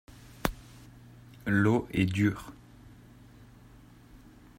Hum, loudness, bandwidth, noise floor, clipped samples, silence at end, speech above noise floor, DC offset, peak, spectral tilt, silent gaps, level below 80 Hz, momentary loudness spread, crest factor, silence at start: none; -29 LUFS; 16 kHz; -54 dBFS; under 0.1%; 0.4 s; 27 dB; under 0.1%; -8 dBFS; -6.5 dB/octave; none; -52 dBFS; 27 LU; 24 dB; 0.45 s